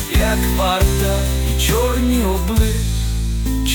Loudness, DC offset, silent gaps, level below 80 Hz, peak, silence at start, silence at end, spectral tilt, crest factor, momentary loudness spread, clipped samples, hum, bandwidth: -18 LUFS; under 0.1%; none; -18 dBFS; -4 dBFS; 0 s; 0 s; -5 dB/octave; 12 dB; 5 LU; under 0.1%; none; 19.5 kHz